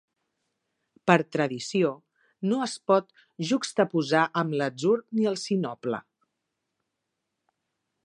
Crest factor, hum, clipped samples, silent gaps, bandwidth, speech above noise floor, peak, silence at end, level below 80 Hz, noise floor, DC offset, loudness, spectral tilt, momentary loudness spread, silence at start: 26 dB; none; under 0.1%; none; 11.5 kHz; 57 dB; -2 dBFS; 2.05 s; -76 dBFS; -83 dBFS; under 0.1%; -26 LUFS; -5.5 dB/octave; 10 LU; 1.05 s